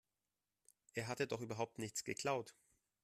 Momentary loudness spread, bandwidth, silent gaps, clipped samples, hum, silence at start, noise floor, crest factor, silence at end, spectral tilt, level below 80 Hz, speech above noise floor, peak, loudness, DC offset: 6 LU; 14.5 kHz; none; under 0.1%; none; 0.95 s; under -90 dBFS; 20 dB; 0.5 s; -4 dB/octave; -80 dBFS; over 47 dB; -26 dBFS; -44 LUFS; under 0.1%